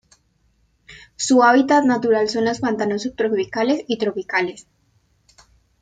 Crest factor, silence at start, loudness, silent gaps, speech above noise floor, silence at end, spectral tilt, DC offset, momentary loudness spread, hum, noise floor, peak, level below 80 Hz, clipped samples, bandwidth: 18 dB; 0.9 s; -19 LUFS; none; 44 dB; 1.2 s; -4 dB/octave; under 0.1%; 10 LU; none; -62 dBFS; -2 dBFS; -60 dBFS; under 0.1%; 9.4 kHz